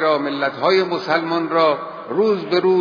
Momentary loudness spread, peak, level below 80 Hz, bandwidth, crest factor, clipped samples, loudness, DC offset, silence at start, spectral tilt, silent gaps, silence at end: 4 LU; -4 dBFS; -68 dBFS; 5.4 kHz; 14 dB; under 0.1%; -19 LUFS; under 0.1%; 0 s; -6.5 dB/octave; none; 0 s